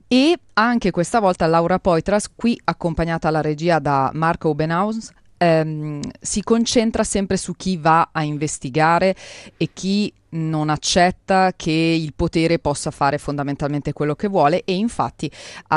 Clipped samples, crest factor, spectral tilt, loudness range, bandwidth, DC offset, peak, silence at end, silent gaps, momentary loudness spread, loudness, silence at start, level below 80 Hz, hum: under 0.1%; 18 dB; -5 dB/octave; 2 LU; 11.5 kHz; under 0.1%; -2 dBFS; 0 s; none; 8 LU; -19 LUFS; 0.1 s; -42 dBFS; none